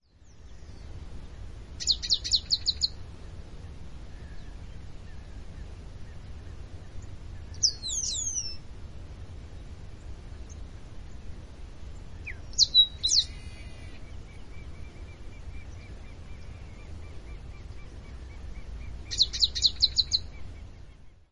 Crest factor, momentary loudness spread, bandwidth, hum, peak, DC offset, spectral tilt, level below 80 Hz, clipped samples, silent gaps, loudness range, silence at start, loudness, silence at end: 24 dB; 24 LU; 11.5 kHz; none; -8 dBFS; under 0.1%; -1 dB/octave; -44 dBFS; under 0.1%; none; 20 LU; 0.1 s; -25 LUFS; 0.05 s